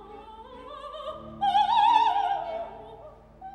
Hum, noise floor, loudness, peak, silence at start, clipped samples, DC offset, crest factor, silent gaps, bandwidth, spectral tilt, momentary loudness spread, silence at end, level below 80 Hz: none; -48 dBFS; -24 LUFS; -8 dBFS; 0 s; under 0.1%; under 0.1%; 20 dB; none; 10 kHz; -3.5 dB/octave; 24 LU; 0 s; -56 dBFS